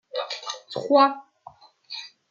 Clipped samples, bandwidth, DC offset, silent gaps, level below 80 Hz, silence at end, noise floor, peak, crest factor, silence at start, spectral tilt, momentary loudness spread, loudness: under 0.1%; 7.6 kHz; under 0.1%; none; -80 dBFS; 0.25 s; -50 dBFS; -6 dBFS; 20 dB; 0.15 s; -3.5 dB/octave; 18 LU; -23 LUFS